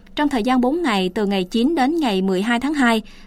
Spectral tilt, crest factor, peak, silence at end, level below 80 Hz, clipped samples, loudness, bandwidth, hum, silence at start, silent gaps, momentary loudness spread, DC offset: -5.5 dB/octave; 14 dB; -6 dBFS; 0 s; -44 dBFS; under 0.1%; -19 LUFS; 15 kHz; none; 0.15 s; none; 3 LU; under 0.1%